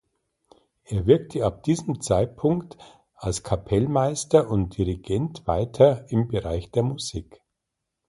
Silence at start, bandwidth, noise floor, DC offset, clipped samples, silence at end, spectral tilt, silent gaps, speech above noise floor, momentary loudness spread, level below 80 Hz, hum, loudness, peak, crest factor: 0.9 s; 11.5 kHz; -82 dBFS; under 0.1%; under 0.1%; 0.85 s; -6.5 dB/octave; none; 59 dB; 10 LU; -42 dBFS; none; -24 LUFS; -4 dBFS; 22 dB